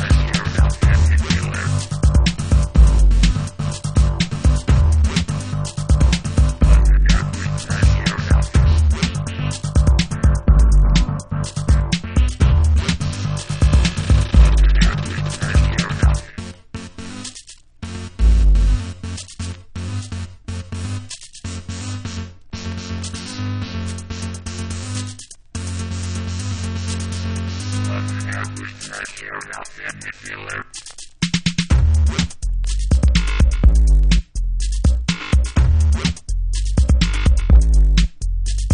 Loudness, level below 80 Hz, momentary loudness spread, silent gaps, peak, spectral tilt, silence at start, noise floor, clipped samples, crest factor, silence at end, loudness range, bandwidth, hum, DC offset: -19 LUFS; -18 dBFS; 15 LU; none; 0 dBFS; -5.5 dB/octave; 0 s; -41 dBFS; under 0.1%; 16 dB; 0 s; 10 LU; 10.5 kHz; none; under 0.1%